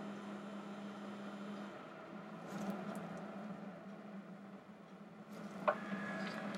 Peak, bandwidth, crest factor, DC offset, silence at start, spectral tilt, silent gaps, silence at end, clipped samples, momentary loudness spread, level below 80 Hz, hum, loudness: -18 dBFS; 16 kHz; 28 dB; under 0.1%; 0 s; -6 dB/octave; none; 0 s; under 0.1%; 14 LU; -88 dBFS; none; -47 LUFS